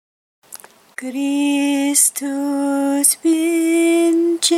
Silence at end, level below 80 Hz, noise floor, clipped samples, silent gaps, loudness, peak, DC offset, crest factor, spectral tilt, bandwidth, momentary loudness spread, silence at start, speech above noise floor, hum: 0 s; -74 dBFS; -41 dBFS; under 0.1%; none; -16 LUFS; 0 dBFS; under 0.1%; 16 dB; -0.5 dB/octave; 15.5 kHz; 9 LU; 0.5 s; 24 dB; none